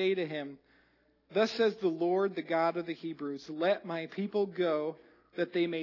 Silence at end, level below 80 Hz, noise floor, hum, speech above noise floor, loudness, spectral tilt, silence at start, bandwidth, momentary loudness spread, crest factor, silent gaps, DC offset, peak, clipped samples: 0 s; -82 dBFS; -69 dBFS; none; 37 dB; -33 LUFS; -6.5 dB/octave; 0 s; 6 kHz; 10 LU; 18 dB; none; under 0.1%; -14 dBFS; under 0.1%